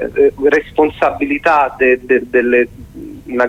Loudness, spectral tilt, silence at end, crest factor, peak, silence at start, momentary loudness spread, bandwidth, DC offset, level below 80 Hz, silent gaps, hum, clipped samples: -14 LUFS; -6.5 dB/octave; 0 s; 14 dB; 0 dBFS; 0 s; 12 LU; 9 kHz; under 0.1%; -42 dBFS; none; 50 Hz at -45 dBFS; under 0.1%